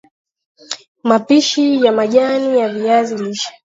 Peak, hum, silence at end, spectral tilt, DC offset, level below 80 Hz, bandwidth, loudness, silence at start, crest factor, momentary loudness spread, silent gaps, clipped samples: 0 dBFS; none; 0.3 s; -4 dB/octave; under 0.1%; -68 dBFS; 7.8 kHz; -14 LUFS; 0.7 s; 16 dB; 12 LU; 0.88-0.95 s; under 0.1%